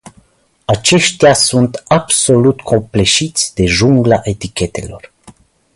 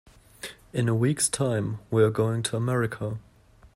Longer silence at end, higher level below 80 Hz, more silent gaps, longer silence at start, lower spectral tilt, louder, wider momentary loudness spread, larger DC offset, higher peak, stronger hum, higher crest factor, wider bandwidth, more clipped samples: first, 0.7 s vs 0.55 s; first, -36 dBFS vs -56 dBFS; neither; second, 0.05 s vs 0.45 s; about the same, -4 dB/octave vs -5 dB/octave; first, -12 LUFS vs -26 LUFS; second, 11 LU vs 17 LU; neither; first, 0 dBFS vs -8 dBFS; neither; about the same, 14 dB vs 18 dB; second, 11.5 kHz vs 16 kHz; neither